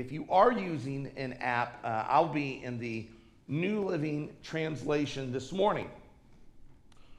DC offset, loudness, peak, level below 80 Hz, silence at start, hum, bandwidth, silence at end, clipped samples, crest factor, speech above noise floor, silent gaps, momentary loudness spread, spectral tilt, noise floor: under 0.1%; -32 LUFS; -10 dBFS; -60 dBFS; 0 s; none; 11 kHz; 0.05 s; under 0.1%; 22 dB; 23 dB; none; 12 LU; -6.5 dB/octave; -55 dBFS